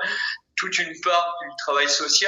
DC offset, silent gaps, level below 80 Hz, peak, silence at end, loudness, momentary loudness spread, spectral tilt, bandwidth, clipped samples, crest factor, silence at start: under 0.1%; none; -74 dBFS; -6 dBFS; 0 s; -22 LUFS; 8 LU; 0.5 dB/octave; 15.5 kHz; under 0.1%; 18 dB; 0 s